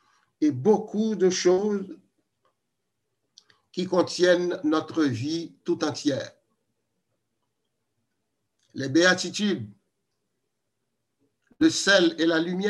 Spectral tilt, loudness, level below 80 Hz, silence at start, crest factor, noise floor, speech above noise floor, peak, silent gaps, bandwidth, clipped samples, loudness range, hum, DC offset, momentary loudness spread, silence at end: -4.5 dB/octave; -24 LUFS; -72 dBFS; 0.4 s; 20 dB; -81 dBFS; 57 dB; -6 dBFS; none; 11.5 kHz; under 0.1%; 6 LU; none; under 0.1%; 13 LU; 0 s